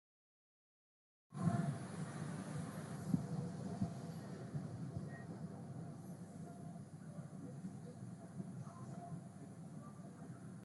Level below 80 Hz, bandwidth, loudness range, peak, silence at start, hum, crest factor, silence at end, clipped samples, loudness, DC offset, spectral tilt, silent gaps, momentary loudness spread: -76 dBFS; 12 kHz; 8 LU; -22 dBFS; 1.3 s; none; 24 dB; 0 s; under 0.1%; -47 LUFS; under 0.1%; -7.5 dB/octave; none; 12 LU